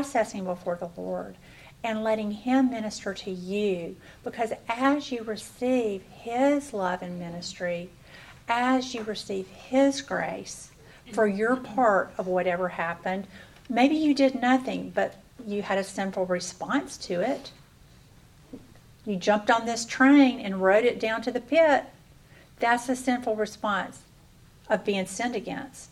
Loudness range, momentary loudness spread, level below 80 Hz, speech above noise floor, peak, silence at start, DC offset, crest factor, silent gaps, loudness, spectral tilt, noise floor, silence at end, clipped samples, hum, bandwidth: 7 LU; 14 LU; -60 dBFS; 28 dB; -8 dBFS; 0 s; under 0.1%; 18 dB; none; -27 LUFS; -4.5 dB/octave; -54 dBFS; 0.05 s; under 0.1%; none; 13.5 kHz